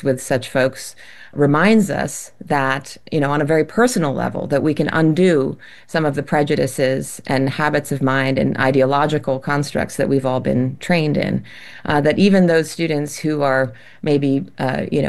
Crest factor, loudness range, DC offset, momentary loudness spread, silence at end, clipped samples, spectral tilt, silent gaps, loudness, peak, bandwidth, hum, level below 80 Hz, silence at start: 16 dB; 1 LU; 1%; 10 LU; 0 s; under 0.1%; -6 dB/octave; none; -18 LUFS; -2 dBFS; 12.5 kHz; none; -50 dBFS; 0 s